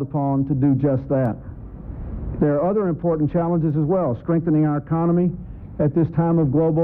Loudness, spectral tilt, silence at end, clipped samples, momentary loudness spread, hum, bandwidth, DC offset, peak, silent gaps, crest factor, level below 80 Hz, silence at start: -20 LUFS; -13.5 dB/octave; 0 s; under 0.1%; 15 LU; none; 2.9 kHz; under 0.1%; -8 dBFS; none; 12 dB; -40 dBFS; 0 s